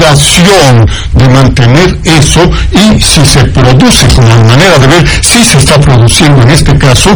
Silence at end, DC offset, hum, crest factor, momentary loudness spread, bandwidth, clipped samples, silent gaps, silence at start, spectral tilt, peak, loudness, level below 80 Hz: 0 s; 4%; none; 2 dB; 3 LU; over 20 kHz; 20%; none; 0 s; -4.5 dB/octave; 0 dBFS; -3 LUFS; -14 dBFS